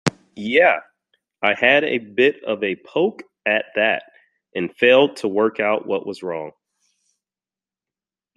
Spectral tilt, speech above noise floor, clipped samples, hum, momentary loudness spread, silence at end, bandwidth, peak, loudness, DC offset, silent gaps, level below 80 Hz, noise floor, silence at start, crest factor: -5 dB/octave; over 71 dB; under 0.1%; none; 13 LU; 1.85 s; 11.5 kHz; 0 dBFS; -19 LUFS; under 0.1%; none; -66 dBFS; under -90 dBFS; 0.05 s; 20 dB